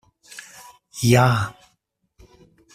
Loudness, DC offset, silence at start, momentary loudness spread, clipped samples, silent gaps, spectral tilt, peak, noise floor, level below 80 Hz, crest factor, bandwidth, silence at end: -19 LUFS; under 0.1%; 0.35 s; 25 LU; under 0.1%; none; -5.5 dB/octave; -2 dBFS; -70 dBFS; -52 dBFS; 20 dB; 15.5 kHz; 1.25 s